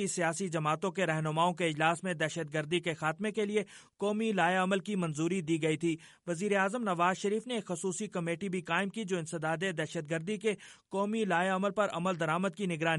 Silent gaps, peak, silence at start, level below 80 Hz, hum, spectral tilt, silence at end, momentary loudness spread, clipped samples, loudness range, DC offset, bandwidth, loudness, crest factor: none; -14 dBFS; 0 s; -76 dBFS; none; -5 dB/octave; 0 s; 6 LU; under 0.1%; 3 LU; under 0.1%; 11.5 kHz; -32 LUFS; 18 dB